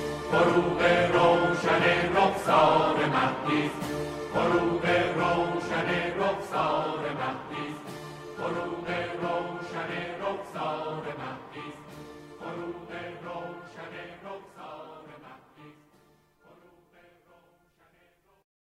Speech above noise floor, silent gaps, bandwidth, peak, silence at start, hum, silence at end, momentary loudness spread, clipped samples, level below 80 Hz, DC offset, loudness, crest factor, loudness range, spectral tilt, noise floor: 42 dB; none; 15 kHz; -10 dBFS; 0 s; none; 3.05 s; 20 LU; under 0.1%; -56 dBFS; under 0.1%; -27 LUFS; 20 dB; 19 LU; -5.5 dB/octave; -65 dBFS